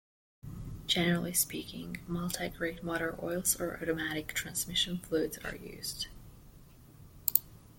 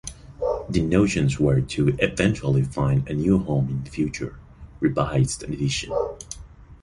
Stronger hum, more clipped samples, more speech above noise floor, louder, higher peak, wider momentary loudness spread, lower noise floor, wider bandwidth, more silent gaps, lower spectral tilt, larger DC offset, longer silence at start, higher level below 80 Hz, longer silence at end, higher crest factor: neither; neither; about the same, 21 dB vs 21 dB; second, -33 LUFS vs -23 LUFS; about the same, -2 dBFS vs -4 dBFS; first, 13 LU vs 10 LU; first, -55 dBFS vs -43 dBFS; first, 17 kHz vs 11.5 kHz; neither; second, -3 dB/octave vs -6 dB/octave; neither; first, 0.45 s vs 0.05 s; second, -54 dBFS vs -40 dBFS; about the same, 0 s vs 0.05 s; first, 34 dB vs 20 dB